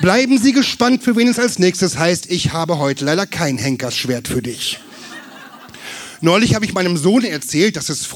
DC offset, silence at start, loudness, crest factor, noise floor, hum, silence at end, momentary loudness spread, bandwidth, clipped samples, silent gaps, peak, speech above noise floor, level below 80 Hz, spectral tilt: under 0.1%; 0 s; -16 LUFS; 16 dB; -37 dBFS; none; 0 s; 18 LU; 18.5 kHz; under 0.1%; none; 0 dBFS; 22 dB; -48 dBFS; -4.5 dB/octave